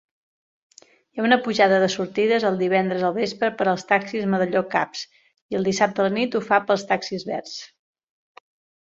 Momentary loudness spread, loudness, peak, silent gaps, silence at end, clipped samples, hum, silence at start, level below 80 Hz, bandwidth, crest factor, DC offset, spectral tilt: 11 LU; -22 LUFS; -2 dBFS; 5.42-5.49 s; 1.15 s; under 0.1%; none; 1.15 s; -66 dBFS; 7.8 kHz; 20 dB; under 0.1%; -5 dB/octave